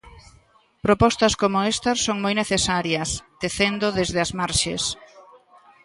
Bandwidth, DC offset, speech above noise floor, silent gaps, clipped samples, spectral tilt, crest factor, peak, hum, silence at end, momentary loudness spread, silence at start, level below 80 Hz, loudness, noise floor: 11.5 kHz; under 0.1%; 35 dB; none; under 0.1%; -3.5 dB/octave; 20 dB; -4 dBFS; none; 0.65 s; 9 LU; 0.05 s; -44 dBFS; -22 LUFS; -57 dBFS